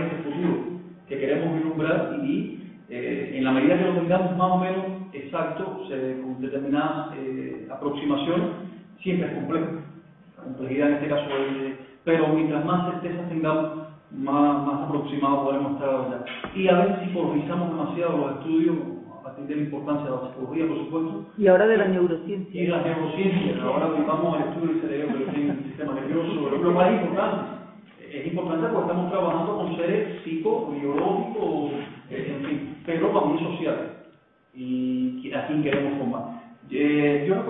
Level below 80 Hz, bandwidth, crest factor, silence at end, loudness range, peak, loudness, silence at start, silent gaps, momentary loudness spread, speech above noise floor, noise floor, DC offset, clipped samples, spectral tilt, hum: -64 dBFS; 4 kHz; 20 dB; 0 s; 4 LU; -6 dBFS; -25 LUFS; 0 s; none; 12 LU; 32 dB; -56 dBFS; under 0.1%; under 0.1%; -11.5 dB/octave; none